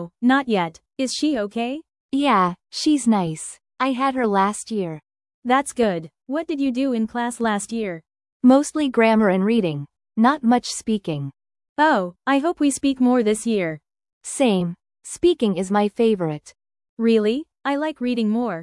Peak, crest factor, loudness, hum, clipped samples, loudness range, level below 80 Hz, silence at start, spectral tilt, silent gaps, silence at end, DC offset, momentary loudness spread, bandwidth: -4 dBFS; 18 dB; -21 LUFS; none; under 0.1%; 4 LU; -60 dBFS; 0 s; -5 dB/octave; 2.00-2.09 s, 5.34-5.42 s, 8.32-8.40 s, 11.69-11.76 s, 14.13-14.21 s, 16.89-16.97 s; 0 s; under 0.1%; 12 LU; 12 kHz